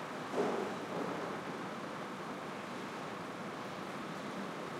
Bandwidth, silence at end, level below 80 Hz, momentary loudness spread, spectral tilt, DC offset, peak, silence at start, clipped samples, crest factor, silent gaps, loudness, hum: 16 kHz; 0 s; -80 dBFS; 7 LU; -5 dB/octave; under 0.1%; -24 dBFS; 0 s; under 0.1%; 18 dB; none; -41 LUFS; none